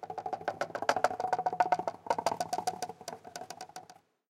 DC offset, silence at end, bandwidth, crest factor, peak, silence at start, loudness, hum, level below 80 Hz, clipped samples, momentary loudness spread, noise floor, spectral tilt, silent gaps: under 0.1%; 0.35 s; 16.5 kHz; 26 dB; -8 dBFS; 0 s; -34 LUFS; none; -76 dBFS; under 0.1%; 15 LU; -58 dBFS; -3 dB/octave; none